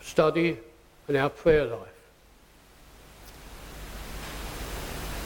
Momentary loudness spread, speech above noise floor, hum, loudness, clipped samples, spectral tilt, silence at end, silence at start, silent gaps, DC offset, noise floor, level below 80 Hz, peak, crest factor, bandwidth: 24 LU; 32 dB; none; -28 LUFS; under 0.1%; -5.5 dB/octave; 0 s; 0 s; none; under 0.1%; -56 dBFS; -44 dBFS; -8 dBFS; 22 dB; 17.5 kHz